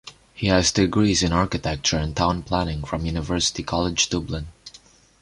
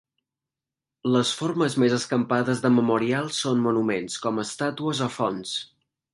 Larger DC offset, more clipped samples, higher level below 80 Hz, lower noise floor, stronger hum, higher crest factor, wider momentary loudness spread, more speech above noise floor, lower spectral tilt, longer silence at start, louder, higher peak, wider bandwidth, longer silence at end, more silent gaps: neither; neither; first, -36 dBFS vs -68 dBFS; second, -51 dBFS vs -89 dBFS; neither; about the same, 18 dB vs 18 dB; about the same, 9 LU vs 7 LU; second, 29 dB vs 65 dB; about the same, -4 dB/octave vs -5 dB/octave; second, 0.05 s vs 1.05 s; about the same, -22 LUFS vs -24 LUFS; first, -4 dBFS vs -8 dBFS; about the same, 11.5 kHz vs 11.5 kHz; about the same, 0.45 s vs 0.5 s; neither